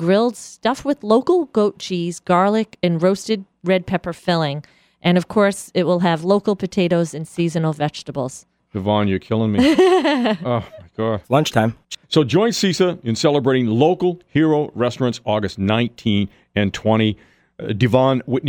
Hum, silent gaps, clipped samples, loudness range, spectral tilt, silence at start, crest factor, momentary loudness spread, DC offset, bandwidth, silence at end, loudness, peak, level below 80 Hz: none; none; under 0.1%; 3 LU; -6 dB/octave; 0 s; 16 dB; 8 LU; under 0.1%; 17.5 kHz; 0 s; -19 LUFS; -2 dBFS; -52 dBFS